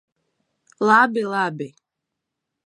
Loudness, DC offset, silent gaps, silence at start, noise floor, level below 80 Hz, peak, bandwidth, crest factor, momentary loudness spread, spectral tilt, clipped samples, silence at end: -19 LUFS; under 0.1%; none; 0.8 s; -82 dBFS; -78 dBFS; -2 dBFS; 11.5 kHz; 20 dB; 18 LU; -5.5 dB/octave; under 0.1%; 0.95 s